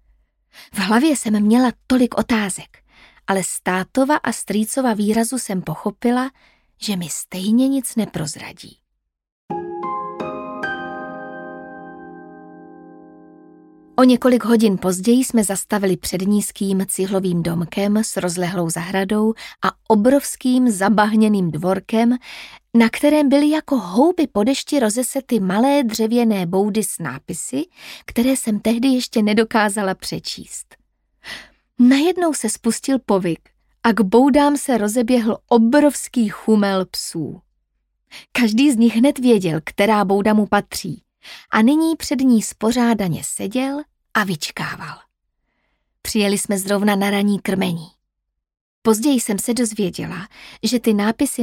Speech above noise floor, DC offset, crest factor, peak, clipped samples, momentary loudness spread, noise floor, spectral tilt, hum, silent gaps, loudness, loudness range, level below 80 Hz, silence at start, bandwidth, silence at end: 59 dB; under 0.1%; 16 dB; -2 dBFS; under 0.1%; 14 LU; -77 dBFS; -5 dB/octave; none; 9.32-9.48 s, 48.61-48.82 s; -18 LUFS; 6 LU; -52 dBFS; 0.6 s; 17 kHz; 0 s